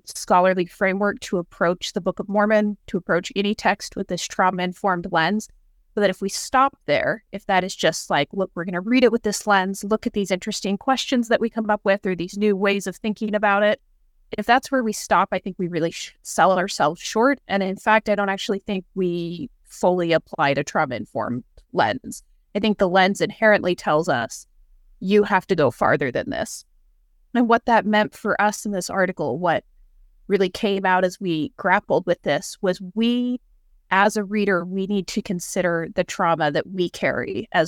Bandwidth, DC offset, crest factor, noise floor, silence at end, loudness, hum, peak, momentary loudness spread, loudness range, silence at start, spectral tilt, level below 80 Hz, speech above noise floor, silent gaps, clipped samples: 17.5 kHz; under 0.1%; 18 dB; -58 dBFS; 0 s; -22 LUFS; none; -4 dBFS; 9 LU; 2 LU; 0.05 s; -4.5 dB/octave; -54 dBFS; 37 dB; none; under 0.1%